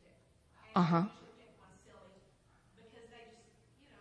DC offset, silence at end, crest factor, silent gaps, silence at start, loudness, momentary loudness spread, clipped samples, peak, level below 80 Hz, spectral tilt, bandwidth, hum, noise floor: under 0.1%; 2.9 s; 22 dB; none; 0.75 s; -33 LUFS; 29 LU; under 0.1%; -18 dBFS; -74 dBFS; -8 dB/octave; 8.8 kHz; none; -68 dBFS